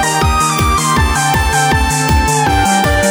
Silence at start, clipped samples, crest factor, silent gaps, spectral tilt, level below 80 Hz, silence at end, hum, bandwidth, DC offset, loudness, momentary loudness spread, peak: 0 s; under 0.1%; 12 dB; none; -3.5 dB/octave; -20 dBFS; 0 s; none; over 20 kHz; under 0.1%; -12 LUFS; 1 LU; 0 dBFS